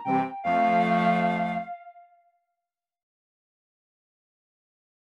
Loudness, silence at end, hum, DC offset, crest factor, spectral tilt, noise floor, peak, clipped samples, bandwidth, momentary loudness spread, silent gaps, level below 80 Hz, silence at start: -25 LUFS; 3.1 s; none; under 0.1%; 18 dB; -7.5 dB/octave; -88 dBFS; -12 dBFS; under 0.1%; 8.6 kHz; 13 LU; none; -80 dBFS; 0 s